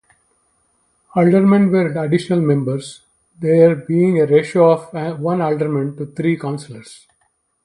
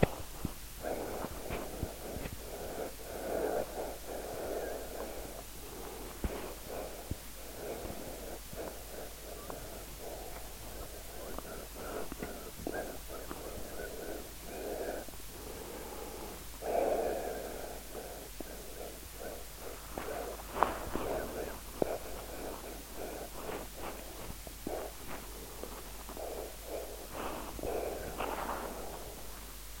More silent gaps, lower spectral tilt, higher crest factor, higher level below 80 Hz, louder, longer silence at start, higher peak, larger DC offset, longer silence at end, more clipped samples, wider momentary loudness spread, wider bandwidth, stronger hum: neither; first, -8 dB/octave vs -4 dB/octave; second, 16 dB vs 34 dB; second, -60 dBFS vs -50 dBFS; first, -16 LUFS vs -41 LUFS; first, 1.15 s vs 0 s; first, 0 dBFS vs -6 dBFS; second, under 0.1% vs 0.2%; first, 0.7 s vs 0 s; neither; first, 13 LU vs 9 LU; second, 11.5 kHz vs 17 kHz; neither